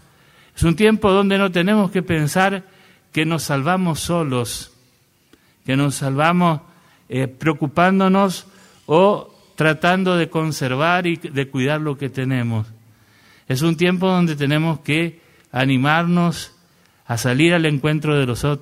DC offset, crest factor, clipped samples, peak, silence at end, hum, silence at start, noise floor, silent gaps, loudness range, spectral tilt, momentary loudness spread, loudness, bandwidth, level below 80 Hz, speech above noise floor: under 0.1%; 18 dB; under 0.1%; -2 dBFS; 0.05 s; none; 0.55 s; -58 dBFS; none; 4 LU; -6 dB/octave; 11 LU; -18 LUFS; 15.5 kHz; -46 dBFS; 40 dB